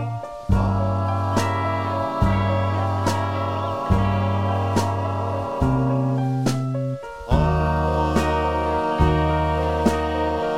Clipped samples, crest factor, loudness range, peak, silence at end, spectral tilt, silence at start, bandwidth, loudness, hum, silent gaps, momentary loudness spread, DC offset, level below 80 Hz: under 0.1%; 16 dB; 2 LU; -4 dBFS; 0 s; -7 dB/octave; 0 s; 13.5 kHz; -22 LUFS; none; none; 4 LU; under 0.1%; -30 dBFS